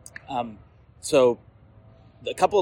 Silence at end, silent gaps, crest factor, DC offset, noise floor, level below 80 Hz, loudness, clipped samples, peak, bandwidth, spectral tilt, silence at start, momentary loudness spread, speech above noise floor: 0 s; none; 18 dB; under 0.1%; -52 dBFS; -58 dBFS; -24 LUFS; under 0.1%; -6 dBFS; 16.5 kHz; -4.5 dB/octave; 0.3 s; 16 LU; 29 dB